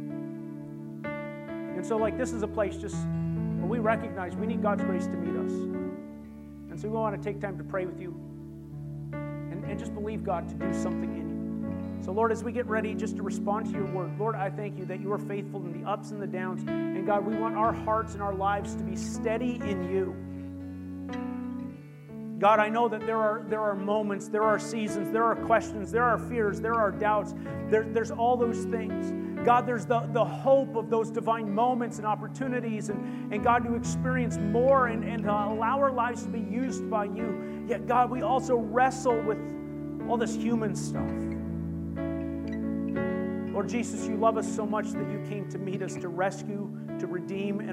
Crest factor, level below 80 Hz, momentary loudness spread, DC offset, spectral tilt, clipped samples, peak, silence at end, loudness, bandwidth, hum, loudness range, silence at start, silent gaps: 20 dB; -56 dBFS; 11 LU; under 0.1%; -6.5 dB/octave; under 0.1%; -10 dBFS; 0 s; -30 LUFS; 13.5 kHz; none; 7 LU; 0 s; none